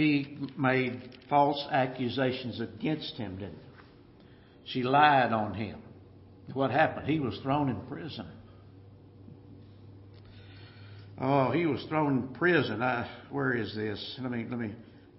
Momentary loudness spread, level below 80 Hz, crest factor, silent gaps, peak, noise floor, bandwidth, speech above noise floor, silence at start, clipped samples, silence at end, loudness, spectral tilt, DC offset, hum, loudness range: 21 LU; -64 dBFS; 22 dB; none; -8 dBFS; -55 dBFS; 5.8 kHz; 26 dB; 0 s; under 0.1%; 0.2 s; -30 LUFS; -4.5 dB/octave; under 0.1%; none; 9 LU